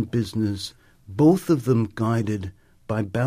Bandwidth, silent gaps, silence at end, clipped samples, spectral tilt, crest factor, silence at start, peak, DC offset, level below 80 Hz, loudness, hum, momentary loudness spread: 15.5 kHz; none; 0 s; under 0.1%; -7.5 dB/octave; 16 dB; 0 s; -6 dBFS; under 0.1%; -54 dBFS; -23 LUFS; none; 15 LU